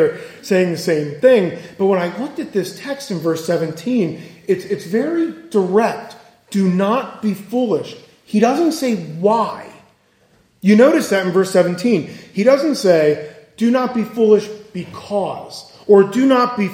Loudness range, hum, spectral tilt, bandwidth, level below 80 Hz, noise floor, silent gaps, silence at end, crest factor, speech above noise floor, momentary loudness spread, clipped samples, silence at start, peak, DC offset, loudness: 5 LU; none; -6 dB/octave; 16.5 kHz; -64 dBFS; -55 dBFS; none; 0 s; 16 dB; 39 dB; 13 LU; under 0.1%; 0 s; 0 dBFS; under 0.1%; -17 LUFS